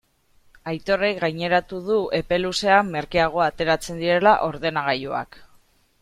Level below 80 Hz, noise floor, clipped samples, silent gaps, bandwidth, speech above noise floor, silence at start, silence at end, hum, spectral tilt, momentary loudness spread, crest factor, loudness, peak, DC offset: -48 dBFS; -58 dBFS; under 0.1%; none; 15.5 kHz; 37 dB; 0.65 s; 0.55 s; none; -4.5 dB/octave; 11 LU; 20 dB; -22 LUFS; -4 dBFS; under 0.1%